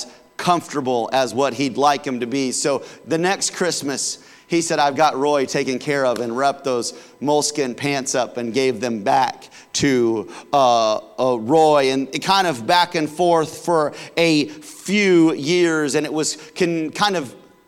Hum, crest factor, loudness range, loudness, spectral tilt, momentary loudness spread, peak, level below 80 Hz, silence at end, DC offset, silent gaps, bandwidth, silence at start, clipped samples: none; 14 dB; 3 LU; -19 LUFS; -4 dB/octave; 8 LU; -4 dBFS; -64 dBFS; 0.3 s; under 0.1%; none; 16.5 kHz; 0 s; under 0.1%